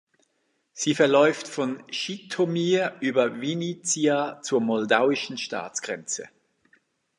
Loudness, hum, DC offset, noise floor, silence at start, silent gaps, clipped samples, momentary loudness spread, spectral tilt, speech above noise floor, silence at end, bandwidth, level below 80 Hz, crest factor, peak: -25 LUFS; none; under 0.1%; -73 dBFS; 0.75 s; none; under 0.1%; 11 LU; -4 dB/octave; 48 dB; 0.9 s; 11.5 kHz; -78 dBFS; 22 dB; -4 dBFS